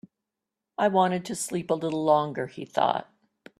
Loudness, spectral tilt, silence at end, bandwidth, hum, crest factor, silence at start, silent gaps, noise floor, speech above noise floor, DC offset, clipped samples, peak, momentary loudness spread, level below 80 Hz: -26 LUFS; -5 dB/octave; 0.55 s; 13.5 kHz; none; 20 dB; 0.8 s; none; -87 dBFS; 61 dB; under 0.1%; under 0.1%; -8 dBFS; 9 LU; -70 dBFS